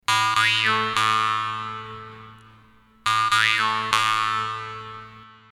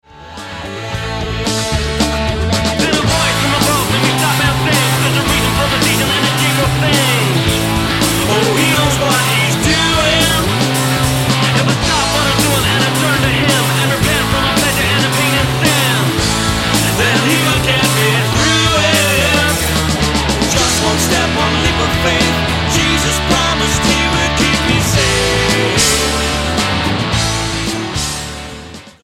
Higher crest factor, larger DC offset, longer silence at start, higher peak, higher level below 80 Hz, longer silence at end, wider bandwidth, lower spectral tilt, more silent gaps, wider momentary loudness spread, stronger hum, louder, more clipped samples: first, 24 dB vs 14 dB; neither; about the same, 0.1 s vs 0.15 s; about the same, 0 dBFS vs 0 dBFS; second, -62 dBFS vs -26 dBFS; about the same, 0.2 s vs 0.15 s; second, 15 kHz vs 17 kHz; second, -1.5 dB/octave vs -3.5 dB/octave; neither; first, 19 LU vs 5 LU; neither; second, -21 LUFS vs -12 LUFS; neither